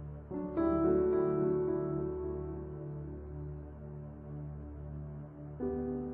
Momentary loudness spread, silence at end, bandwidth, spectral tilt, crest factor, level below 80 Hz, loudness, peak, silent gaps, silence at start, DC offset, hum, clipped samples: 17 LU; 0 s; 2.8 kHz; -11.5 dB/octave; 16 dB; -50 dBFS; -36 LUFS; -20 dBFS; none; 0 s; under 0.1%; none; under 0.1%